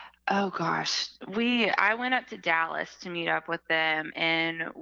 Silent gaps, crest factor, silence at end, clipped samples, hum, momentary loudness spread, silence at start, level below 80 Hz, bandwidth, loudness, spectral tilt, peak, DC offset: none; 24 dB; 0 s; under 0.1%; none; 7 LU; 0 s; -72 dBFS; 7.8 kHz; -27 LUFS; -3.5 dB/octave; -6 dBFS; under 0.1%